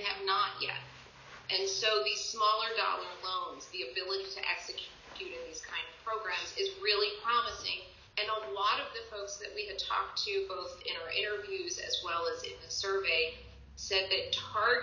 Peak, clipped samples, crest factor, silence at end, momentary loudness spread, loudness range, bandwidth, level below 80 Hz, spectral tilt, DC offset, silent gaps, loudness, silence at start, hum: -16 dBFS; under 0.1%; 20 dB; 0 s; 12 LU; 4 LU; 7.4 kHz; -64 dBFS; -1 dB/octave; under 0.1%; none; -33 LUFS; 0 s; none